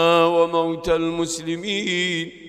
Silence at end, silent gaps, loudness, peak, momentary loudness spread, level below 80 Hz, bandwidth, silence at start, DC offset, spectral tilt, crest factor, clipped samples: 0 s; none; -21 LUFS; -4 dBFS; 8 LU; -48 dBFS; 14 kHz; 0 s; under 0.1%; -4 dB/octave; 18 dB; under 0.1%